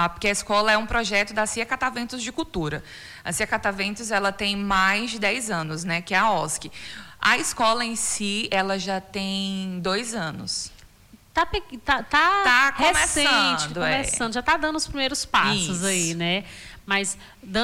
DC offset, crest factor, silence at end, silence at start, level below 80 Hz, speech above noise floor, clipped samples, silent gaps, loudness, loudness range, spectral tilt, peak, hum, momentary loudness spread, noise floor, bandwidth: under 0.1%; 16 dB; 0 s; 0 s; -46 dBFS; 28 dB; under 0.1%; none; -23 LUFS; 6 LU; -2.5 dB/octave; -8 dBFS; none; 11 LU; -52 dBFS; 18 kHz